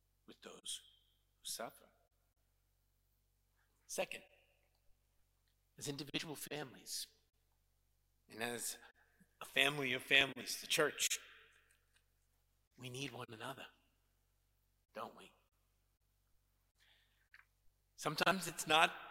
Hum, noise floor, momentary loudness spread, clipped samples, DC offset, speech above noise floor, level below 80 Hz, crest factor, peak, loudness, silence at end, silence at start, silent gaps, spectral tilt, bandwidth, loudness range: none; -80 dBFS; 20 LU; under 0.1%; under 0.1%; 39 dB; -80 dBFS; 30 dB; -14 dBFS; -39 LUFS; 0 s; 0.3 s; 12.67-12.71 s; -2 dB/octave; 16.5 kHz; 19 LU